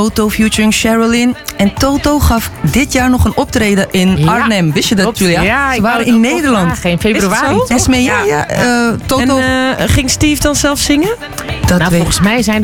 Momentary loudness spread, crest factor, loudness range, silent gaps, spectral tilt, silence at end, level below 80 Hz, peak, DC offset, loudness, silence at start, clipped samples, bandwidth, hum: 3 LU; 10 dB; 1 LU; none; -4.5 dB/octave; 0 s; -26 dBFS; 0 dBFS; under 0.1%; -11 LUFS; 0 s; under 0.1%; 18.5 kHz; none